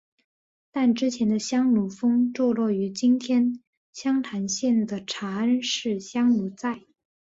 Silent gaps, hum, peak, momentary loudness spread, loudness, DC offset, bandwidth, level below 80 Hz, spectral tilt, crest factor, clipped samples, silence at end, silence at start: 3.67-3.93 s; none; -12 dBFS; 9 LU; -24 LUFS; under 0.1%; 8 kHz; -68 dBFS; -4.5 dB/octave; 12 dB; under 0.1%; 0.4 s; 0.75 s